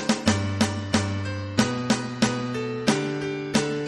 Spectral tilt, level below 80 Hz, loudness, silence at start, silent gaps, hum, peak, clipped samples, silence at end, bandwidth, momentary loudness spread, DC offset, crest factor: -4.5 dB/octave; -54 dBFS; -25 LUFS; 0 s; none; none; -4 dBFS; under 0.1%; 0 s; 13 kHz; 5 LU; under 0.1%; 20 dB